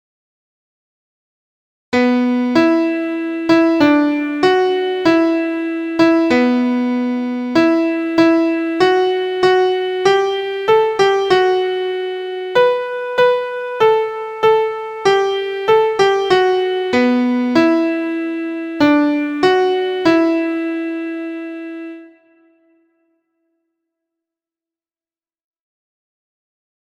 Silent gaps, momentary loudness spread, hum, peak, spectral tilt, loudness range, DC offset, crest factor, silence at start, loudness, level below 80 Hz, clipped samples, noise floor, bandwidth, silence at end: none; 8 LU; none; 0 dBFS; -5 dB/octave; 4 LU; under 0.1%; 16 dB; 1.9 s; -15 LUFS; -58 dBFS; under 0.1%; under -90 dBFS; 8.8 kHz; 4.85 s